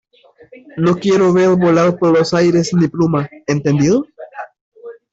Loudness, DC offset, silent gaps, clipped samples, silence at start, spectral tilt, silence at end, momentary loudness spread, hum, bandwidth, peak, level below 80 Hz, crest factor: -14 LUFS; under 0.1%; 4.61-4.72 s; under 0.1%; 0.75 s; -6.5 dB/octave; 0.2 s; 20 LU; none; 8 kHz; -2 dBFS; -52 dBFS; 12 dB